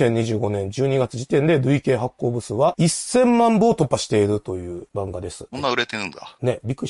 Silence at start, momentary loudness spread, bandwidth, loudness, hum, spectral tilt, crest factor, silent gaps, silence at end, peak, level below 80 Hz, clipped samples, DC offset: 0 s; 13 LU; 11.5 kHz; -21 LUFS; none; -5.5 dB/octave; 16 dB; none; 0 s; -4 dBFS; -48 dBFS; under 0.1%; under 0.1%